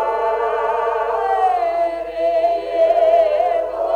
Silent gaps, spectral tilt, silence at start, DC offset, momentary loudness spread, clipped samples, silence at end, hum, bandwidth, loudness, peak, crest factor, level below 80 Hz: none; -4.5 dB/octave; 0 s; under 0.1%; 6 LU; under 0.1%; 0 s; none; 8.6 kHz; -18 LUFS; -4 dBFS; 12 dB; -50 dBFS